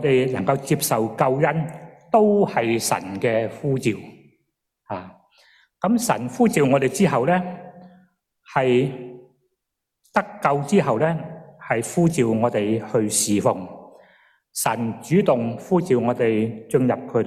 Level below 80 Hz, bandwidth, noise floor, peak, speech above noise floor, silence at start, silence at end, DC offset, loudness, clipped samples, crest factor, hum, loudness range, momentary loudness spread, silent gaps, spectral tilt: -60 dBFS; 16 kHz; -81 dBFS; -4 dBFS; 61 dB; 0 s; 0 s; under 0.1%; -21 LUFS; under 0.1%; 18 dB; none; 4 LU; 14 LU; none; -5.5 dB/octave